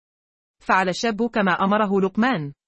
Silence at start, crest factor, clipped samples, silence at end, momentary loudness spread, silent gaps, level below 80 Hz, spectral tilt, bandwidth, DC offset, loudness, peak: 0.7 s; 18 dB; under 0.1%; 0.15 s; 3 LU; none; -58 dBFS; -5.5 dB/octave; 8.6 kHz; under 0.1%; -21 LUFS; -4 dBFS